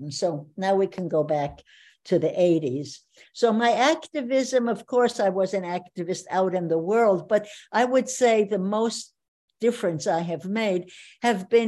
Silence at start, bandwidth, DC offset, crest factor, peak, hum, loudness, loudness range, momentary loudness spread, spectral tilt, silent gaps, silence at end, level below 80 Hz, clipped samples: 0 s; 12 kHz; under 0.1%; 18 dB; -8 dBFS; none; -24 LUFS; 2 LU; 10 LU; -5 dB/octave; 9.28-9.48 s; 0 s; -66 dBFS; under 0.1%